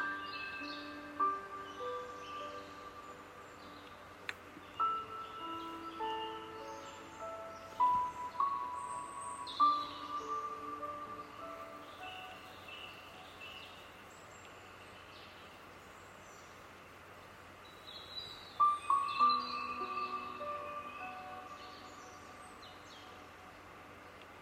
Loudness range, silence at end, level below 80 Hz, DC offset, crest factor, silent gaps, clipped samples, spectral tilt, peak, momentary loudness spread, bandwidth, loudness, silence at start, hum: 16 LU; 0 s; -74 dBFS; under 0.1%; 22 dB; none; under 0.1%; -3 dB/octave; -20 dBFS; 21 LU; 16 kHz; -39 LUFS; 0 s; none